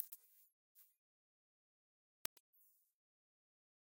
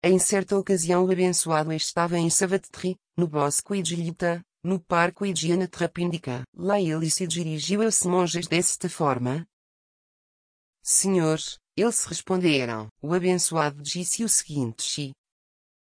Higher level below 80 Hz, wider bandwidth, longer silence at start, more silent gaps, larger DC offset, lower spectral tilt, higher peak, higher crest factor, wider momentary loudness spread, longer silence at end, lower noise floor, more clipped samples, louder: second, under -90 dBFS vs -64 dBFS; first, 16 kHz vs 10.5 kHz; about the same, 0 s vs 0 s; second, 0.53-0.75 s vs 6.48-6.53 s, 9.53-10.73 s, 12.91-12.96 s; neither; second, 0 dB/octave vs -4 dB/octave; second, -12 dBFS vs -8 dBFS; first, 48 dB vs 18 dB; first, 20 LU vs 9 LU; first, 3.15 s vs 0.8 s; about the same, under -90 dBFS vs under -90 dBFS; neither; second, -50 LUFS vs -24 LUFS